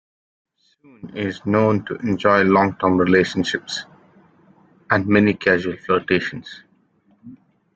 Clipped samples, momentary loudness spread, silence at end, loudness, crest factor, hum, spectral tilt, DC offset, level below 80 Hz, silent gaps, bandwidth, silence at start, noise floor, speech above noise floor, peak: under 0.1%; 13 LU; 0.4 s; -19 LUFS; 20 dB; none; -6 dB/octave; under 0.1%; -56 dBFS; none; 8 kHz; 1.05 s; -60 dBFS; 41 dB; 0 dBFS